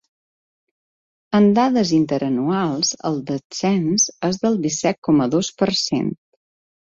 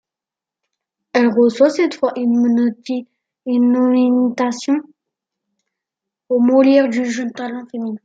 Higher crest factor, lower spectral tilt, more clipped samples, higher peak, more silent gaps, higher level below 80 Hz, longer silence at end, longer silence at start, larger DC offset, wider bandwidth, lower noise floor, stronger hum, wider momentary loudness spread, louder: about the same, 16 dB vs 16 dB; about the same, -4.5 dB/octave vs -5.5 dB/octave; neither; about the same, -4 dBFS vs -2 dBFS; first, 3.44-3.50 s, 4.98-5.02 s vs none; first, -58 dBFS vs -70 dBFS; first, 0.7 s vs 0.1 s; first, 1.3 s vs 1.15 s; neither; about the same, 7.8 kHz vs 7.8 kHz; about the same, under -90 dBFS vs -88 dBFS; neither; second, 8 LU vs 13 LU; second, -19 LUFS vs -16 LUFS